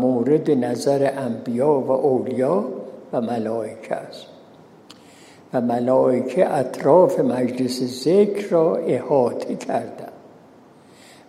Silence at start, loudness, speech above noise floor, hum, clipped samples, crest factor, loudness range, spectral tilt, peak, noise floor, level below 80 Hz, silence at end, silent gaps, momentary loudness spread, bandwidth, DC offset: 0 s; -20 LUFS; 29 dB; none; under 0.1%; 18 dB; 7 LU; -6.5 dB/octave; -2 dBFS; -48 dBFS; -72 dBFS; 1 s; none; 12 LU; 14.5 kHz; under 0.1%